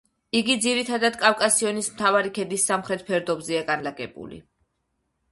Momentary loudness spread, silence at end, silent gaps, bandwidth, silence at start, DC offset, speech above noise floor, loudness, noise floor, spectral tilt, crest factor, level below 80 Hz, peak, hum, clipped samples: 12 LU; 0.9 s; none; 12 kHz; 0.35 s; under 0.1%; 51 dB; -23 LUFS; -75 dBFS; -2 dB/octave; 24 dB; -64 dBFS; -2 dBFS; none; under 0.1%